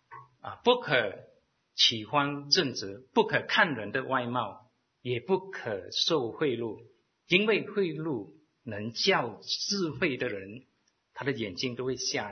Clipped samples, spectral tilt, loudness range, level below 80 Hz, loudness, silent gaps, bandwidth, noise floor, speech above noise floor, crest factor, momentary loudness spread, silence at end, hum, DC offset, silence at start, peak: under 0.1%; -3.5 dB/octave; 4 LU; -70 dBFS; -29 LUFS; none; 6.6 kHz; -52 dBFS; 23 dB; 24 dB; 16 LU; 0 s; none; under 0.1%; 0.1 s; -6 dBFS